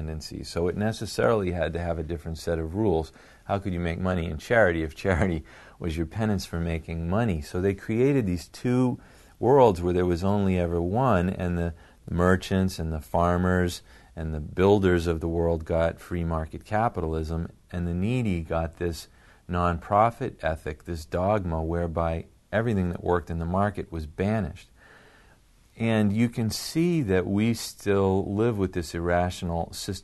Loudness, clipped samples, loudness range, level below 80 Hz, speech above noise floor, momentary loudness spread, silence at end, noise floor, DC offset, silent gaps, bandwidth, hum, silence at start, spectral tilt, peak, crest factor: -26 LUFS; under 0.1%; 5 LU; -42 dBFS; 32 dB; 10 LU; 0.05 s; -57 dBFS; under 0.1%; none; 12.5 kHz; none; 0 s; -7 dB/octave; -6 dBFS; 20 dB